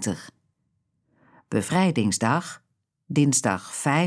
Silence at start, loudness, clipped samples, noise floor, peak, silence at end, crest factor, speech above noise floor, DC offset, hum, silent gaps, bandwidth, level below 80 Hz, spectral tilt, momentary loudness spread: 0 s; -24 LUFS; under 0.1%; -73 dBFS; -6 dBFS; 0 s; 18 dB; 50 dB; under 0.1%; none; none; 11 kHz; -66 dBFS; -4.5 dB/octave; 13 LU